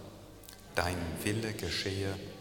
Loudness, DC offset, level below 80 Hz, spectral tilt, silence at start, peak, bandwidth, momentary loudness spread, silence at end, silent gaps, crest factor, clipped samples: -35 LUFS; under 0.1%; -54 dBFS; -4.5 dB/octave; 0 s; -10 dBFS; 19 kHz; 17 LU; 0 s; none; 26 dB; under 0.1%